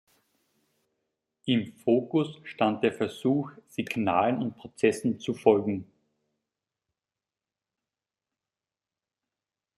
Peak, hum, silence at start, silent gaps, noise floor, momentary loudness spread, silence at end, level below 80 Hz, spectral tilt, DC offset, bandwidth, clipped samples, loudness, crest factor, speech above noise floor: -6 dBFS; none; 1.45 s; none; under -90 dBFS; 11 LU; 3.95 s; -74 dBFS; -6.5 dB/octave; under 0.1%; 13 kHz; under 0.1%; -28 LUFS; 24 dB; over 63 dB